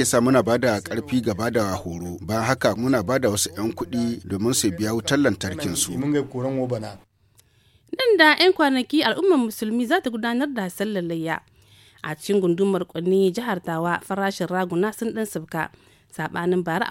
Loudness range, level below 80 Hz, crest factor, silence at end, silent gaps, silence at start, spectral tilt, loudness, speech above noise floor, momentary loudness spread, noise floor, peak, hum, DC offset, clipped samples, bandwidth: 5 LU; -56 dBFS; 20 dB; 0 s; none; 0 s; -4.5 dB/octave; -22 LUFS; 37 dB; 11 LU; -59 dBFS; -2 dBFS; none; under 0.1%; under 0.1%; 17 kHz